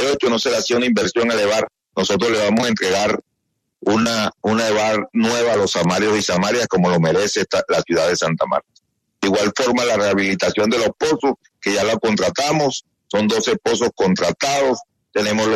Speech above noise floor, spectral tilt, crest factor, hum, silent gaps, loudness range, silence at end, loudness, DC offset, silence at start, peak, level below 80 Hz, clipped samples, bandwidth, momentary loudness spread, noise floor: 56 dB; -4 dB/octave; 12 dB; none; none; 2 LU; 0 s; -18 LUFS; under 0.1%; 0 s; -6 dBFS; -56 dBFS; under 0.1%; 13.5 kHz; 5 LU; -73 dBFS